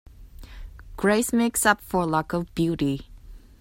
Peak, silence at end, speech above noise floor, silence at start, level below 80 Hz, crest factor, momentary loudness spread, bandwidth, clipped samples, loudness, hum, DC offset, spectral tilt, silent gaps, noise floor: -4 dBFS; 0.2 s; 20 dB; 0.2 s; -44 dBFS; 22 dB; 23 LU; 16.5 kHz; under 0.1%; -24 LUFS; none; under 0.1%; -4.5 dB/octave; none; -43 dBFS